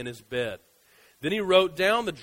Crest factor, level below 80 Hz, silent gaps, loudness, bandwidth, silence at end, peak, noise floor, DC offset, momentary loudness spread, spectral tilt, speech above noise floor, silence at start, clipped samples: 22 dB; -60 dBFS; none; -25 LUFS; 16 kHz; 0 s; -6 dBFS; -60 dBFS; under 0.1%; 13 LU; -4.5 dB/octave; 34 dB; 0 s; under 0.1%